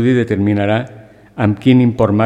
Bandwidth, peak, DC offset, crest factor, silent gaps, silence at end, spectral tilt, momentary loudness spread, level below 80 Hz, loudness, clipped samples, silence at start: 8.6 kHz; 0 dBFS; under 0.1%; 14 dB; none; 0 s; -8.5 dB/octave; 12 LU; -44 dBFS; -14 LUFS; under 0.1%; 0 s